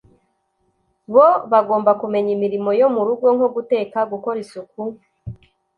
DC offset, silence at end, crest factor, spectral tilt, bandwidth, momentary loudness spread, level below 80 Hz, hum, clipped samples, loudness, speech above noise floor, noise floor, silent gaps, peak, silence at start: under 0.1%; 0.45 s; 18 dB; -8 dB/octave; 10 kHz; 19 LU; -56 dBFS; none; under 0.1%; -17 LUFS; 50 dB; -67 dBFS; none; -2 dBFS; 1.1 s